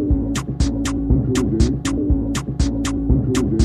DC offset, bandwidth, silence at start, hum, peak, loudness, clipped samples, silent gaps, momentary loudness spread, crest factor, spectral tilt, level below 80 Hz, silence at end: under 0.1%; 13.5 kHz; 0 s; none; -4 dBFS; -20 LUFS; under 0.1%; none; 4 LU; 14 dB; -6.5 dB/octave; -24 dBFS; 0 s